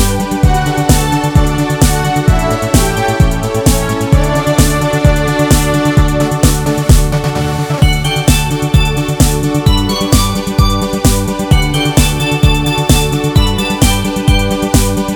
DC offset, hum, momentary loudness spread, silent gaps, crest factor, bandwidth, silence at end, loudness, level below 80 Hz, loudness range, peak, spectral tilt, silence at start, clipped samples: under 0.1%; none; 2 LU; none; 10 dB; 20 kHz; 0 s; -12 LUFS; -16 dBFS; 1 LU; 0 dBFS; -5 dB/octave; 0 s; 0.5%